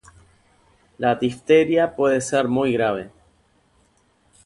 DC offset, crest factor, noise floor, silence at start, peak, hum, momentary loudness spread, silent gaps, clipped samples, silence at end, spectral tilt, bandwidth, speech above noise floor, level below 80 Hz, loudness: under 0.1%; 18 dB; -61 dBFS; 1 s; -4 dBFS; none; 8 LU; none; under 0.1%; 1.35 s; -5.5 dB/octave; 11.5 kHz; 42 dB; -58 dBFS; -20 LUFS